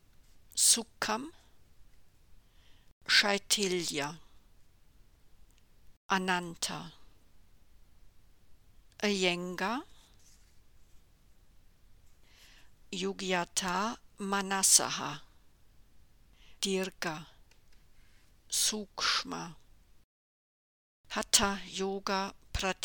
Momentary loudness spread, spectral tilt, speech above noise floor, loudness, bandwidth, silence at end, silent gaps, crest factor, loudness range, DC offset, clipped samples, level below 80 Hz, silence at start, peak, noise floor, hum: 16 LU; -1.5 dB/octave; 28 dB; -30 LUFS; 19 kHz; 0 s; 2.92-3.01 s, 5.97-6.09 s, 20.04-21.04 s; 28 dB; 8 LU; under 0.1%; under 0.1%; -58 dBFS; 0.2 s; -8 dBFS; -60 dBFS; none